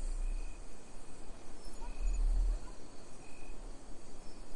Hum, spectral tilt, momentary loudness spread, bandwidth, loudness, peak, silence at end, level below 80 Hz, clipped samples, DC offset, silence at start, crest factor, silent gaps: none; -5 dB/octave; 17 LU; 11 kHz; -45 LUFS; -22 dBFS; 0 s; -38 dBFS; under 0.1%; under 0.1%; 0 s; 12 dB; none